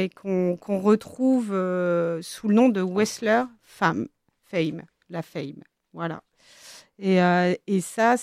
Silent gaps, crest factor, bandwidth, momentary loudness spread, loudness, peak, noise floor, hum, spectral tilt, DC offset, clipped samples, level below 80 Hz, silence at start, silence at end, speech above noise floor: none; 18 dB; 14.5 kHz; 15 LU; -24 LUFS; -6 dBFS; -49 dBFS; none; -6 dB/octave; under 0.1%; under 0.1%; -70 dBFS; 0 s; 0 s; 26 dB